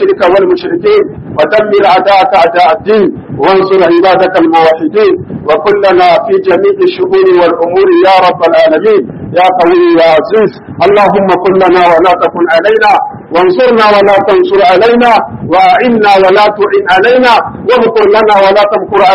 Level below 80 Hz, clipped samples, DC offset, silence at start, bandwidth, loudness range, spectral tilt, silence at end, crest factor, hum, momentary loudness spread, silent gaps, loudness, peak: -42 dBFS; 2%; under 0.1%; 0 s; 8.8 kHz; 2 LU; -6.5 dB/octave; 0 s; 6 dB; none; 5 LU; none; -6 LUFS; 0 dBFS